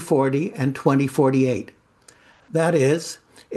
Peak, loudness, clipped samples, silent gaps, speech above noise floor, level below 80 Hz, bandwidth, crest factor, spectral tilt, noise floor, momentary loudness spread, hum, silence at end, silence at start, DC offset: -4 dBFS; -21 LUFS; under 0.1%; none; 34 dB; -64 dBFS; 12.5 kHz; 18 dB; -6.5 dB/octave; -54 dBFS; 12 LU; none; 0 s; 0 s; under 0.1%